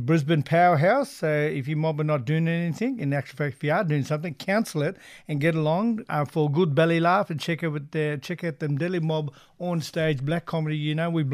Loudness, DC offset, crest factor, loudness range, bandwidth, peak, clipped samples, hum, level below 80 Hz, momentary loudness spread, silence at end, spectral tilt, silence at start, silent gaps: -25 LUFS; under 0.1%; 16 dB; 4 LU; 14 kHz; -10 dBFS; under 0.1%; none; -64 dBFS; 8 LU; 0 s; -7 dB/octave; 0 s; none